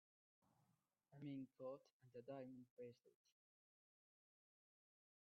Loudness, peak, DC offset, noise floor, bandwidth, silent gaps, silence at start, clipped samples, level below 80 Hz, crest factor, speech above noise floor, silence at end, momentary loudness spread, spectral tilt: -58 LUFS; -44 dBFS; under 0.1%; -87 dBFS; 4.8 kHz; 1.93-2.00 s, 2.70-2.77 s; 1.1 s; under 0.1%; under -90 dBFS; 18 dB; 29 dB; 2.2 s; 7 LU; -7.5 dB/octave